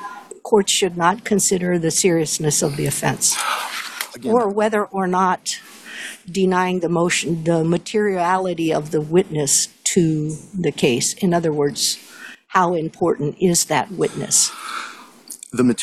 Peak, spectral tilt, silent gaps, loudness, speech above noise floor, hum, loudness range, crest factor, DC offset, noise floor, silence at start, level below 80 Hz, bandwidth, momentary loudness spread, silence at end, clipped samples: -2 dBFS; -3.5 dB/octave; none; -19 LUFS; 21 dB; none; 2 LU; 18 dB; under 0.1%; -39 dBFS; 0 s; -56 dBFS; 15 kHz; 12 LU; 0 s; under 0.1%